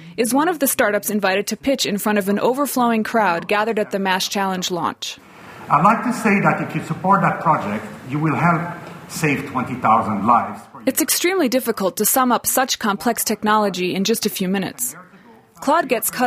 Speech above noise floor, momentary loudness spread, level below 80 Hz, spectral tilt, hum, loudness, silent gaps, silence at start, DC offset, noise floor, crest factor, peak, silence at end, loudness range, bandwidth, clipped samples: 28 dB; 9 LU; -58 dBFS; -4 dB/octave; none; -19 LUFS; none; 0 s; under 0.1%; -47 dBFS; 18 dB; 0 dBFS; 0 s; 2 LU; 16 kHz; under 0.1%